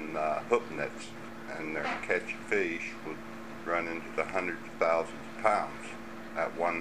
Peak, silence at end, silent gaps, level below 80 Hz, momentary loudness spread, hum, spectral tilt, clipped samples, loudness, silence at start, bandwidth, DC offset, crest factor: -10 dBFS; 0 s; none; -64 dBFS; 13 LU; none; -4.5 dB/octave; under 0.1%; -33 LUFS; 0 s; 15.5 kHz; 0.4%; 24 dB